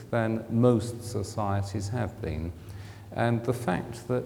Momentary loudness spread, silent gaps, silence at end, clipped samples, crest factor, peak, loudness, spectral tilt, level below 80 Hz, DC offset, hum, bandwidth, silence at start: 14 LU; none; 0 s; under 0.1%; 20 dB; -8 dBFS; -29 LUFS; -7 dB/octave; -52 dBFS; under 0.1%; none; 16.5 kHz; 0 s